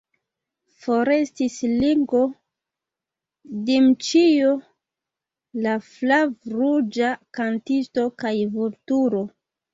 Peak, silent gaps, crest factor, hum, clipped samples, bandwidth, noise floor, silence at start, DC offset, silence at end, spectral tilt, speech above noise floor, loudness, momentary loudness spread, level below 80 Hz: -6 dBFS; none; 16 dB; none; under 0.1%; 7.8 kHz; -88 dBFS; 0.85 s; under 0.1%; 0.45 s; -5 dB/octave; 67 dB; -21 LUFS; 10 LU; -60 dBFS